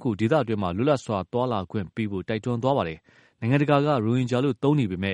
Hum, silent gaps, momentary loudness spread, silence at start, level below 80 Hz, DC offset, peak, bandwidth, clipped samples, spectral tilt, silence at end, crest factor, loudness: none; none; 9 LU; 0 s; -58 dBFS; under 0.1%; -6 dBFS; 10.5 kHz; under 0.1%; -7.5 dB/octave; 0 s; 18 dB; -25 LUFS